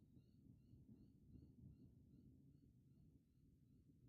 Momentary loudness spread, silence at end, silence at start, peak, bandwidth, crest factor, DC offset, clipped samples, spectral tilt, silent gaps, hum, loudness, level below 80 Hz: 3 LU; 0 s; 0 s; -54 dBFS; 4.5 kHz; 16 dB; under 0.1%; under 0.1%; -10 dB/octave; none; none; -68 LUFS; -78 dBFS